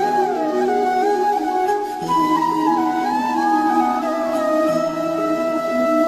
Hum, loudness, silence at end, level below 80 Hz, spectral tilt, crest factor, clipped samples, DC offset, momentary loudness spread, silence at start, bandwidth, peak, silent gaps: none; -19 LUFS; 0 s; -56 dBFS; -5 dB/octave; 14 dB; under 0.1%; under 0.1%; 3 LU; 0 s; 14 kHz; -6 dBFS; none